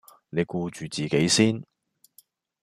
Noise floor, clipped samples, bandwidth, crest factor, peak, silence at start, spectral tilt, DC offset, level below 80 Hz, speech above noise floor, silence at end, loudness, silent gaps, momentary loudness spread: -60 dBFS; under 0.1%; 15.5 kHz; 20 dB; -6 dBFS; 0.35 s; -4 dB/octave; under 0.1%; -62 dBFS; 36 dB; 1 s; -25 LUFS; none; 12 LU